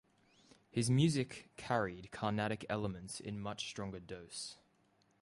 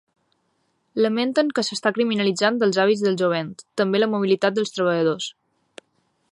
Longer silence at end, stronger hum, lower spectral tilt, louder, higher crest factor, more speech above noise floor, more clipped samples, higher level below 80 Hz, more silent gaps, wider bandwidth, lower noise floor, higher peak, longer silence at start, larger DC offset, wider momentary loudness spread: second, 0.65 s vs 1 s; neither; about the same, -5.5 dB/octave vs -5 dB/octave; second, -39 LUFS vs -21 LUFS; about the same, 20 dB vs 18 dB; second, 36 dB vs 49 dB; neither; first, -66 dBFS vs -72 dBFS; neither; about the same, 11.5 kHz vs 11.5 kHz; first, -74 dBFS vs -69 dBFS; second, -20 dBFS vs -4 dBFS; second, 0.75 s vs 0.95 s; neither; first, 14 LU vs 7 LU